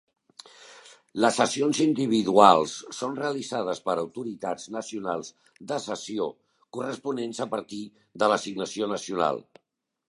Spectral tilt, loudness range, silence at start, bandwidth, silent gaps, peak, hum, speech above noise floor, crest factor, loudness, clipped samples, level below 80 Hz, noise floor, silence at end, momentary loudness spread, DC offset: -4 dB/octave; 10 LU; 0.6 s; 11.5 kHz; none; -2 dBFS; none; 52 dB; 26 dB; -26 LUFS; under 0.1%; -70 dBFS; -78 dBFS; 0.7 s; 14 LU; under 0.1%